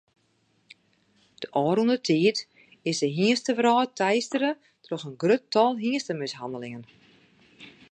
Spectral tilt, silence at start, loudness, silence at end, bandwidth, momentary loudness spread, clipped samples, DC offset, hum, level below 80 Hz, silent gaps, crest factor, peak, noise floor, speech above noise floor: -5 dB/octave; 1.4 s; -25 LUFS; 0.2 s; 10 kHz; 14 LU; under 0.1%; under 0.1%; none; -76 dBFS; none; 18 dB; -8 dBFS; -68 dBFS; 44 dB